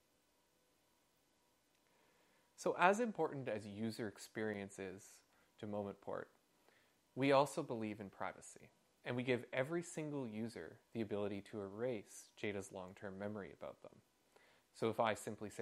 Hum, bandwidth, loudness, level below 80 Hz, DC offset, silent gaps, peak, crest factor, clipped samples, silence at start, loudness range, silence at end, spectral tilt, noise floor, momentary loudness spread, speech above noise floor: none; 15.5 kHz; -42 LUFS; -86 dBFS; under 0.1%; none; -14 dBFS; 30 dB; under 0.1%; 2.6 s; 7 LU; 0 s; -5.5 dB/octave; -78 dBFS; 19 LU; 36 dB